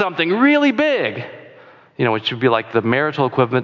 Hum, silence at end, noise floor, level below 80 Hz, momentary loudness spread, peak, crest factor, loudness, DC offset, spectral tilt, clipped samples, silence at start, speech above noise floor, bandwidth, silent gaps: none; 0 s; -45 dBFS; -64 dBFS; 8 LU; -2 dBFS; 14 dB; -17 LUFS; under 0.1%; -7 dB/octave; under 0.1%; 0 s; 28 dB; 7.2 kHz; none